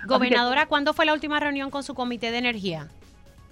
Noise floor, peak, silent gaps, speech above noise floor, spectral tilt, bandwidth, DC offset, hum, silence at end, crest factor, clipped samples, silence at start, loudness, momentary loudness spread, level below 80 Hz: -50 dBFS; -6 dBFS; none; 26 dB; -4.5 dB/octave; 13 kHz; under 0.1%; none; 0.2 s; 20 dB; under 0.1%; 0 s; -23 LUFS; 11 LU; -54 dBFS